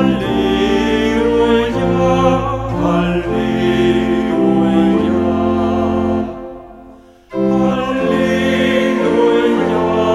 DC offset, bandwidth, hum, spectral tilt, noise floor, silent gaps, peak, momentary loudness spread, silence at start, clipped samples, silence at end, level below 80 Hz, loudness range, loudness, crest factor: under 0.1%; 12 kHz; none; -7 dB/octave; -40 dBFS; none; 0 dBFS; 5 LU; 0 s; under 0.1%; 0 s; -34 dBFS; 3 LU; -14 LUFS; 14 dB